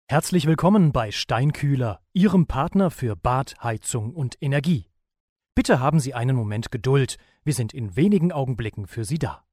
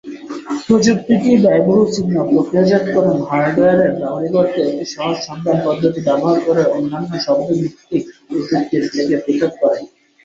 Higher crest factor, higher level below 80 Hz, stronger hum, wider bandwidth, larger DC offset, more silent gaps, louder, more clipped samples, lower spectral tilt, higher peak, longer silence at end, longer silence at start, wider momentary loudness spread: about the same, 18 dB vs 14 dB; first, -42 dBFS vs -54 dBFS; neither; first, 15 kHz vs 7.8 kHz; neither; first, 5.20-5.36 s vs none; second, -23 LUFS vs -16 LUFS; neither; about the same, -6.5 dB/octave vs -6.5 dB/octave; about the same, -4 dBFS vs -2 dBFS; second, 0.15 s vs 0.4 s; about the same, 0.1 s vs 0.05 s; about the same, 9 LU vs 9 LU